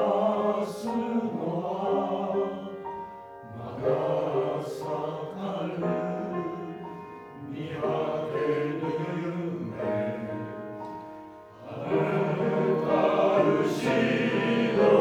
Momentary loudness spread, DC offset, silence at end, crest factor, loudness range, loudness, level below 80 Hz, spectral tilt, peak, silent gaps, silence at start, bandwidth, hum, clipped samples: 16 LU; under 0.1%; 0 s; 20 dB; 7 LU; -28 LUFS; -66 dBFS; -7 dB/octave; -8 dBFS; none; 0 s; 14.5 kHz; none; under 0.1%